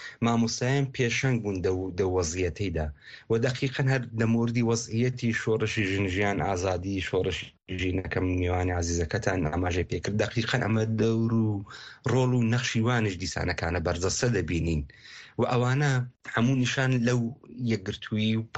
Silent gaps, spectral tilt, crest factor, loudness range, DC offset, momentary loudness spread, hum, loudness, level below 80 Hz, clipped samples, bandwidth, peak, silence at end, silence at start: none; -5.5 dB/octave; 16 dB; 2 LU; under 0.1%; 6 LU; none; -27 LUFS; -46 dBFS; under 0.1%; 8.4 kHz; -10 dBFS; 0 s; 0 s